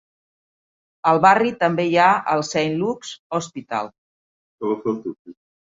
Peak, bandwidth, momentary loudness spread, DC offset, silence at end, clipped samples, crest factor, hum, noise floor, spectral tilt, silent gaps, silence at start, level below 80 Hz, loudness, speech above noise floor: -2 dBFS; 7.8 kHz; 14 LU; under 0.1%; 0.45 s; under 0.1%; 20 dB; none; under -90 dBFS; -5 dB/octave; 3.19-3.30 s, 3.98-4.58 s, 5.19-5.25 s; 1.05 s; -64 dBFS; -20 LUFS; over 70 dB